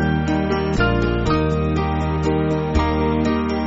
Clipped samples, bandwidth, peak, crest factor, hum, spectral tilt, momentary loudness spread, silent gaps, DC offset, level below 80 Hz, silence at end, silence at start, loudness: under 0.1%; 8 kHz; -6 dBFS; 14 dB; none; -6.5 dB/octave; 2 LU; none; under 0.1%; -28 dBFS; 0 s; 0 s; -20 LUFS